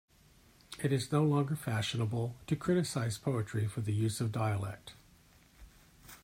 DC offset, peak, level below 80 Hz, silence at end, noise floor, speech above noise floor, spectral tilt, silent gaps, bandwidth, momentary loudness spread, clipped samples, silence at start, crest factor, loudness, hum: under 0.1%; -16 dBFS; -64 dBFS; 0.1 s; -63 dBFS; 30 dB; -6 dB/octave; none; 16 kHz; 10 LU; under 0.1%; 0.7 s; 18 dB; -34 LUFS; none